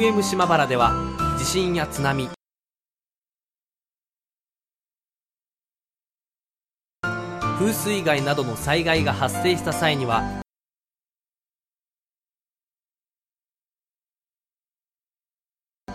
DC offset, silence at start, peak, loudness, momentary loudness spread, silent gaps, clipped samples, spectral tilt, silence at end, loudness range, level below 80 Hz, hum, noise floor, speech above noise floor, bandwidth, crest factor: under 0.1%; 0 s; -4 dBFS; -22 LUFS; 9 LU; 3.18-3.22 s, 15.77-15.81 s; under 0.1%; -4.5 dB/octave; 0 s; 12 LU; -44 dBFS; none; under -90 dBFS; over 68 dB; 14.5 kHz; 22 dB